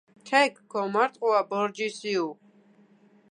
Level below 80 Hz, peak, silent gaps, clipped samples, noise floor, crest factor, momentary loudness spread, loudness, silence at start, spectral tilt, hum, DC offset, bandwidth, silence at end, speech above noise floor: -86 dBFS; -8 dBFS; none; under 0.1%; -59 dBFS; 20 dB; 8 LU; -26 LUFS; 0.25 s; -4 dB/octave; 50 Hz at -50 dBFS; under 0.1%; 10.5 kHz; 0.95 s; 33 dB